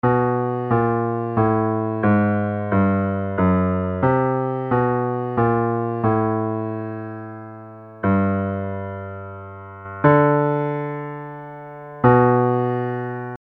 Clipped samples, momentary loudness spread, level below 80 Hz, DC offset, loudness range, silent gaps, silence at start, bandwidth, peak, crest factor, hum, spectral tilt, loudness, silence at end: under 0.1%; 18 LU; -52 dBFS; under 0.1%; 5 LU; none; 0.05 s; 4.1 kHz; -2 dBFS; 20 dB; none; -11.5 dB/octave; -20 LUFS; 0.05 s